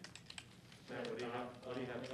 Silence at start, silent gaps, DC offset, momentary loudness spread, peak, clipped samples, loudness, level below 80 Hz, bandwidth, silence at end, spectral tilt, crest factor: 0 s; none; under 0.1%; 11 LU; -32 dBFS; under 0.1%; -47 LUFS; -76 dBFS; 13 kHz; 0 s; -4.5 dB/octave; 16 dB